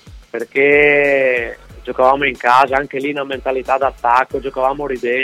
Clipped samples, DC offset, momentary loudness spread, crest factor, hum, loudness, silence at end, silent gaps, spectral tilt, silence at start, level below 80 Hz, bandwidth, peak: under 0.1%; under 0.1%; 12 LU; 16 dB; none; -15 LUFS; 0 s; none; -5 dB/octave; 0.05 s; -42 dBFS; 13.5 kHz; 0 dBFS